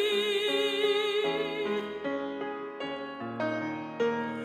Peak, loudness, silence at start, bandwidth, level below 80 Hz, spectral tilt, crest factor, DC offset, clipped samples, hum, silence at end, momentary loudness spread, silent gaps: -16 dBFS; -31 LUFS; 0 s; 14 kHz; -78 dBFS; -4 dB/octave; 14 dB; under 0.1%; under 0.1%; none; 0 s; 10 LU; none